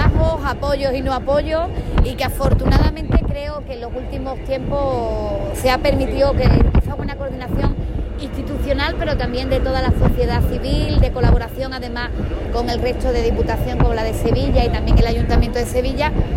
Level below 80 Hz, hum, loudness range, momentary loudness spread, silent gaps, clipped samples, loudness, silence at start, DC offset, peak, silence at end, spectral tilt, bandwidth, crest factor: -20 dBFS; none; 2 LU; 9 LU; none; under 0.1%; -19 LUFS; 0 s; under 0.1%; -4 dBFS; 0 s; -7 dB/octave; 16 kHz; 14 dB